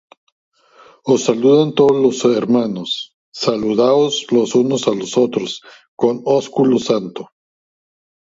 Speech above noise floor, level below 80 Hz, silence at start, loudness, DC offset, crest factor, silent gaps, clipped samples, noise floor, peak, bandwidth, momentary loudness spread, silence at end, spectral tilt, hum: 32 dB; -62 dBFS; 1.05 s; -16 LUFS; under 0.1%; 16 dB; 3.14-3.32 s, 5.88-5.97 s; under 0.1%; -48 dBFS; 0 dBFS; 8 kHz; 11 LU; 1.05 s; -5.5 dB/octave; none